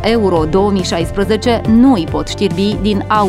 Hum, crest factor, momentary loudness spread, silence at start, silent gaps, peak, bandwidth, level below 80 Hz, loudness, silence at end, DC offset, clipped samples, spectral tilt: none; 12 dB; 7 LU; 0 s; none; 0 dBFS; 13.5 kHz; -28 dBFS; -13 LUFS; 0 s; under 0.1%; under 0.1%; -6 dB/octave